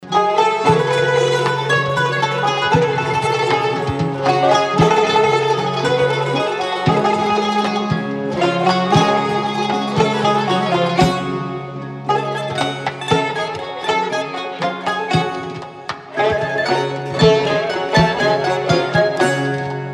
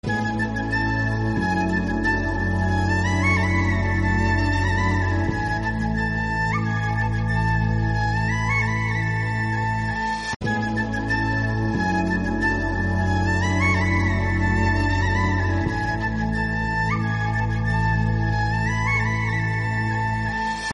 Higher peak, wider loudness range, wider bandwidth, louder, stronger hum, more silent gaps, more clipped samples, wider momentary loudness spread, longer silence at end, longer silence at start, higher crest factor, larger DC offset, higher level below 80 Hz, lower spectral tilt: first, 0 dBFS vs -8 dBFS; first, 5 LU vs 2 LU; first, 12.5 kHz vs 10.5 kHz; first, -17 LUFS vs -22 LUFS; neither; second, none vs 10.36-10.40 s; neither; first, 8 LU vs 4 LU; about the same, 0 s vs 0 s; about the same, 0 s vs 0.05 s; about the same, 16 dB vs 14 dB; neither; second, -46 dBFS vs -32 dBFS; about the same, -5.5 dB/octave vs -6.5 dB/octave